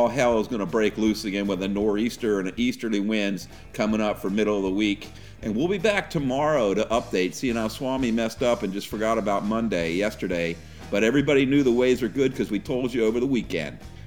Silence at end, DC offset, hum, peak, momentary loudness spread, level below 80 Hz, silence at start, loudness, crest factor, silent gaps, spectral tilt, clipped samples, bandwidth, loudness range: 0 s; 0.4%; none; -6 dBFS; 8 LU; -48 dBFS; 0 s; -24 LUFS; 18 dB; none; -5.5 dB/octave; under 0.1%; 18.5 kHz; 3 LU